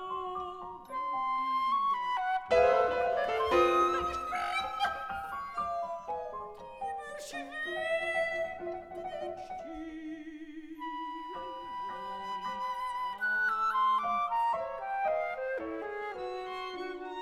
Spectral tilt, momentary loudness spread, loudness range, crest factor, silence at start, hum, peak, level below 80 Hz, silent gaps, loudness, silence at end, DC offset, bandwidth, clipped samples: -4 dB/octave; 14 LU; 11 LU; 20 dB; 0 s; none; -14 dBFS; -60 dBFS; none; -33 LUFS; 0 s; under 0.1%; 14 kHz; under 0.1%